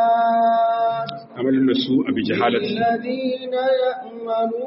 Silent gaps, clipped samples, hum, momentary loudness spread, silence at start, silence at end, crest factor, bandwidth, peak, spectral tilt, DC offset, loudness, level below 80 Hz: none; under 0.1%; none; 8 LU; 0 s; 0 s; 14 dB; 5.8 kHz; -6 dBFS; -3.5 dB/octave; under 0.1%; -20 LUFS; -64 dBFS